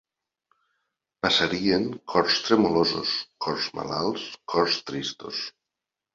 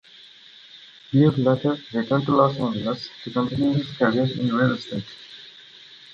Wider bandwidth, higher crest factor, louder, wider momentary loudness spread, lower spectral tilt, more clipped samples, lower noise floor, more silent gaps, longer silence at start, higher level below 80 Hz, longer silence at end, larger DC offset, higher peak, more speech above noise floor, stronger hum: about the same, 7.8 kHz vs 7.8 kHz; about the same, 20 dB vs 20 dB; second, -25 LUFS vs -22 LUFS; second, 11 LU vs 24 LU; second, -4 dB/octave vs -8 dB/octave; neither; first, -87 dBFS vs -48 dBFS; neither; first, 1.25 s vs 0.75 s; about the same, -60 dBFS vs -58 dBFS; first, 0.65 s vs 0.2 s; neither; about the same, -6 dBFS vs -4 dBFS; first, 62 dB vs 26 dB; neither